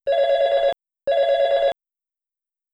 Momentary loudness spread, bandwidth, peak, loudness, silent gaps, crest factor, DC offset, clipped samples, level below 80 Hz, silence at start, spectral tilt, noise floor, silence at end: 7 LU; 7.6 kHz; -10 dBFS; -20 LUFS; none; 12 dB; under 0.1%; under 0.1%; -58 dBFS; 0.05 s; -2.5 dB/octave; -87 dBFS; 1 s